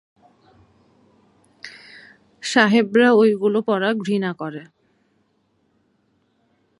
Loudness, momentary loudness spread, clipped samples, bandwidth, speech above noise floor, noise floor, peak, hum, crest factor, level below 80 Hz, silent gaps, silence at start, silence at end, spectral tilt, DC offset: -18 LUFS; 24 LU; under 0.1%; 11.5 kHz; 48 dB; -66 dBFS; -2 dBFS; none; 22 dB; -72 dBFS; none; 1.65 s; 2.15 s; -5 dB/octave; under 0.1%